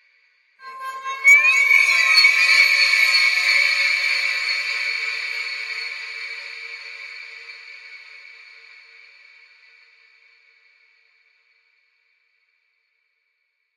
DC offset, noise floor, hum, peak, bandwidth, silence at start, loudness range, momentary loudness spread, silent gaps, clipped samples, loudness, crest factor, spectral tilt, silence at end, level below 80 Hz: under 0.1%; -72 dBFS; none; -2 dBFS; 16.5 kHz; 0.65 s; 22 LU; 23 LU; none; under 0.1%; -15 LUFS; 20 dB; 5 dB/octave; 5.6 s; -78 dBFS